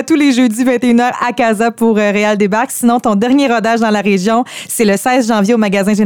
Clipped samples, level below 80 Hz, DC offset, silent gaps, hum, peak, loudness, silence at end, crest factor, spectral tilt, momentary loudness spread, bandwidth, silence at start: under 0.1%; -54 dBFS; 0.2%; none; none; 0 dBFS; -12 LUFS; 0 s; 12 dB; -5 dB/octave; 3 LU; 18.5 kHz; 0 s